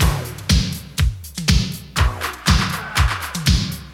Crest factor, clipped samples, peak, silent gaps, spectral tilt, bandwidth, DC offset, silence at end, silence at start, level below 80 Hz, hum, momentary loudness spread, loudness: 18 dB; under 0.1%; 0 dBFS; none; -4 dB/octave; 17 kHz; under 0.1%; 0 s; 0 s; -24 dBFS; none; 5 LU; -20 LUFS